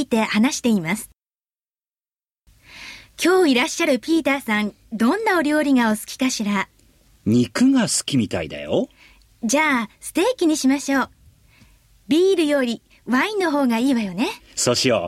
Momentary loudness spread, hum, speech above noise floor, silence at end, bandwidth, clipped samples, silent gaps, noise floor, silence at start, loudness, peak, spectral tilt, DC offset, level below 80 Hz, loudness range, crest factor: 11 LU; none; over 71 dB; 0 s; 15.5 kHz; under 0.1%; none; under -90 dBFS; 0 s; -20 LUFS; -4 dBFS; -4 dB/octave; under 0.1%; -56 dBFS; 3 LU; 16 dB